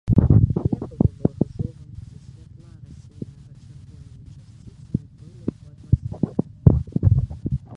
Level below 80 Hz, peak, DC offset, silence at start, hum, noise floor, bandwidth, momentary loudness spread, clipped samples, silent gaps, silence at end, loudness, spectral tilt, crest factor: -32 dBFS; 0 dBFS; under 0.1%; 0.05 s; none; -44 dBFS; 2.1 kHz; 26 LU; under 0.1%; none; 0 s; -22 LUFS; -11.5 dB/octave; 22 dB